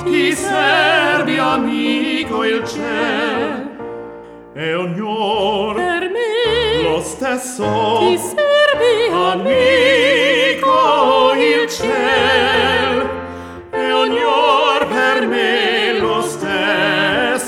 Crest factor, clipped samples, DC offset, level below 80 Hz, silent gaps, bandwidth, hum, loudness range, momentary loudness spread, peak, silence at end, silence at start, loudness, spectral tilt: 14 dB; under 0.1%; under 0.1%; -46 dBFS; none; 16.5 kHz; none; 7 LU; 9 LU; -2 dBFS; 0 s; 0 s; -15 LUFS; -3.5 dB/octave